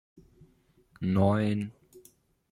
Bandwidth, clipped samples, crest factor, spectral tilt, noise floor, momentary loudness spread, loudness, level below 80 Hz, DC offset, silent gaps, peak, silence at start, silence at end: 15 kHz; under 0.1%; 20 dB; -8.5 dB/octave; -65 dBFS; 11 LU; -28 LUFS; -62 dBFS; under 0.1%; none; -12 dBFS; 1 s; 0.5 s